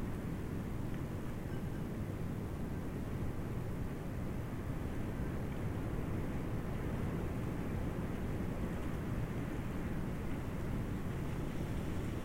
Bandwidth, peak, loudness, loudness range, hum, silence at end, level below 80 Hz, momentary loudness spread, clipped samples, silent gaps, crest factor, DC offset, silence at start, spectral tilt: 16 kHz; -26 dBFS; -41 LUFS; 2 LU; none; 0 s; -46 dBFS; 2 LU; under 0.1%; none; 12 dB; under 0.1%; 0 s; -7.5 dB/octave